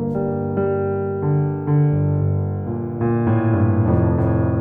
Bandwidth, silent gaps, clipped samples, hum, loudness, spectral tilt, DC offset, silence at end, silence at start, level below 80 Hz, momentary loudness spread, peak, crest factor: 3 kHz; none; under 0.1%; 50 Hz at -40 dBFS; -20 LUFS; -13 dB/octave; under 0.1%; 0 s; 0 s; -40 dBFS; 5 LU; -6 dBFS; 12 dB